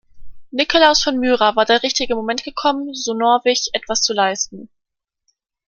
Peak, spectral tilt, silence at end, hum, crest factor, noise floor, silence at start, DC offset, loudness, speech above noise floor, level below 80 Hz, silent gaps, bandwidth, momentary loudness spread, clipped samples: 0 dBFS; -1.5 dB/octave; 1 s; none; 18 dB; -80 dBFS; 0.15 s; under 0.1%; -17 LUFS; 63 dB; -48 dBFS; none; 10 kHz; 10 LU; under 0.1%